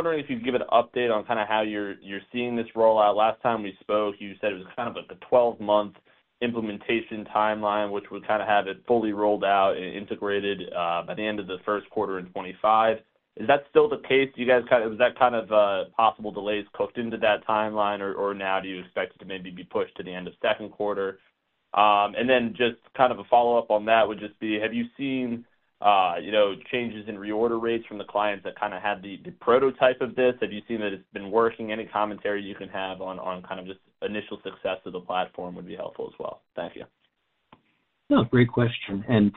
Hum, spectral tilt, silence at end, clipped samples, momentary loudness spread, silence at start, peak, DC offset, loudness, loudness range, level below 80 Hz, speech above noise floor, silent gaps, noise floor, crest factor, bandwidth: none; -3.5 dB/octave; 0 s; under 0.1%; 13 LU; 0 s; -4 dBFS; under 0.1%; -25 LUFS; 9 LU; -62 dBFS; 47 dB; none; -73 dBFS; 22 dB; 4.2 kHz